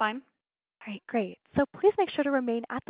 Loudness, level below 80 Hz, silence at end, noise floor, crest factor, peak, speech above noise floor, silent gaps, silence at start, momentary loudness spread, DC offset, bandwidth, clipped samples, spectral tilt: -28 LUFS; -62 dBFS; 0.1 s; -65 dBFS; 18 dB; -12 dBFS; 36 dB; none; 0 s; 17 LU; under 0.1%; 4 kHz; under 0.1%; -9.5 dB/octave